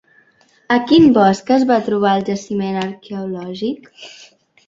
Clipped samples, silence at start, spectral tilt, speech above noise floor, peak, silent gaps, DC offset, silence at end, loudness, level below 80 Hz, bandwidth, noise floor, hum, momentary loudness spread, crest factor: under 0.1%; 0.7 s; -6 dB/octave; 39 dB; -2 dBFS; none; under 0.1%; 0.55 s; -16 LUFS; -56 dBFS; 7.8 kHz; -55 dBFS; none; 18 LU; 16 dB